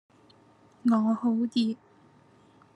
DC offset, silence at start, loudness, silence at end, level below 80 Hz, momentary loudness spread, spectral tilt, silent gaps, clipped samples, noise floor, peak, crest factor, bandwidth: under 0.1%; 0.85 s; -27 LUFS; 1 s; -82 dBFS; 7 LU; -7 dB/octave; none; under 0.1%; -59 dBFS; -14 dBFS; 16 dB; 9.8 kHz